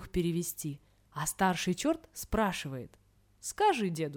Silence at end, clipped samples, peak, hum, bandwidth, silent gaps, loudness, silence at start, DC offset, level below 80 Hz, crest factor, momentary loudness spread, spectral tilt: 0 s; under 0.1%; -16 dBFS; none; over 20 kHz; none; -32 LUFS; 0 s; under 0.1%; -52 dBFS; 18 dB; 15 LU; -4.5 dB/octave